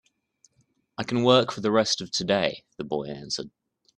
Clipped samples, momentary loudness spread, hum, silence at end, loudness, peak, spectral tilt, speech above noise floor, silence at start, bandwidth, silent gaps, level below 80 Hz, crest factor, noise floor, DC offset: under 0.1%; 16 LU; none; 0.5 s; -25 LUFS; -4 dBFS; -4 dB/octave; 44 dB; 1 s; 11 kHz; none; -64 dBFS; 24 dB; -69 dBFS; under 0.1%